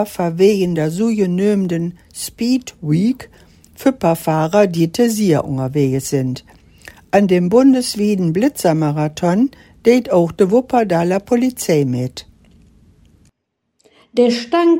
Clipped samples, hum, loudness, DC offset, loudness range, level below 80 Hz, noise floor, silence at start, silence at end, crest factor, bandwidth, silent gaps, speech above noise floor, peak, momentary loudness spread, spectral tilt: under 0.1%; none; -16 LUFS; under 0.1%; 4 LU; -50 dBFS; -72 dBFS; 0 s; 0 s; 16 dB; 16.5 kHz; none; 57 dB; 0 dBFS; 7 LU; -6.5 dB/octave